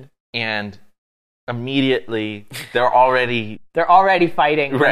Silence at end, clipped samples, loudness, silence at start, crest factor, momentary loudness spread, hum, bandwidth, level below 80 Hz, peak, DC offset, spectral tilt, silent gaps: 0 s; under 0.1%; -18 LUFS; 0 s; 18 dB; 15 LU; none; 15 kHz; -56 dBFS; 0 dBFS; under 0.1%; -6 dB/octave; 0.20-0.33 s, 0.98-1.47 s